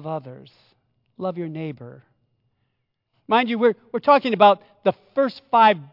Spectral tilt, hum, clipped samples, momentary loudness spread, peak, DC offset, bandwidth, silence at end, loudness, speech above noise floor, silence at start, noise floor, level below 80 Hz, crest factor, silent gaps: -8 dB/octave; none; under 0.1%; 16 LU; -2 dBFS; under 0.1%; 5.8 kHz; 0.05 s; -20 LUFS; 54 dB; 0 s; -75 dBFS; -74 dBFS; 20 dB; none